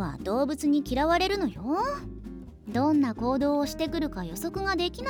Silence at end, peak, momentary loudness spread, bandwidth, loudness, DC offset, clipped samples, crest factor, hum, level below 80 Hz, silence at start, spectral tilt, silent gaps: 0 s; -12 dBFS; 11 LU; 19 kHz; -27 LUFS; under 0.1%; under 0.1%; 16 dB; none; -44 dBFS; 0 s; -5.5 dB/octave; none